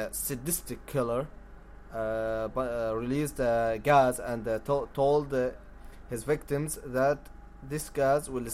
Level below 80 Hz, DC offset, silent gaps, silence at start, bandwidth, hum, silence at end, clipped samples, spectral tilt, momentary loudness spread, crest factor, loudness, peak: -48 dBFS; under 0.1%; none; 0 s; 16 kHz; none; 0 s; under 0.1%; -5 dB/octave; 11 LU; 20 dB; -30 LUFS; -10 dBFS